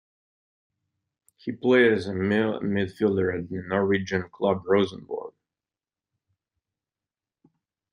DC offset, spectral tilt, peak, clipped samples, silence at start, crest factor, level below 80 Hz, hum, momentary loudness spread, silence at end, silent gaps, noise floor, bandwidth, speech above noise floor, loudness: under 0.1%; -7 dB/octave; -6 dBFS; under 0.1%; 1.45 s; 20 dB; -66 dBFS; none; 16 LU; 2.65 s; none; under -90 dBFS; 10 kHz; over 66 dB; -24 LUFS